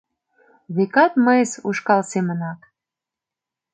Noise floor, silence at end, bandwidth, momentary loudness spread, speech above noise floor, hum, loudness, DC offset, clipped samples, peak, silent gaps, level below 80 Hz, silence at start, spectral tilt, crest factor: -87 dBFS; 1.2 s; 9.2 kHz; 13 LU; 68 dB; none; -19 LUFS; under 0.1%; under 0.1%; -2 dBFS; none; -72 dBFS; 0.7 s; -6 dB/octave; 18 dB